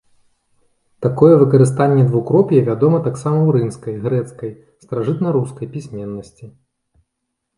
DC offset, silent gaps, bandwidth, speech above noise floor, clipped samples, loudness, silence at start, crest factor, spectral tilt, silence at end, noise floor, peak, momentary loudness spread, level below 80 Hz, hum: under 0.1%; none; 11.5 kHz; 60 dB; under 0.1%; -15 LUFS; 1 s; 16 dB; -9 dB/octave; 1.1 s; -76 dBFS; 0 dBFS; 17 LU; -54 dBFS; none